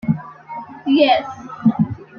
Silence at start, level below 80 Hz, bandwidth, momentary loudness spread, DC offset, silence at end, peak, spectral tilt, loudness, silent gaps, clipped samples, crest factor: 0.05 s; -54 dBFS; 6.8 kHz; 19 LU; under 0.1%; 0 s; -2 dBFS; -8 dB/octave; -18 LUFS; none; under 0.1%; 16 dB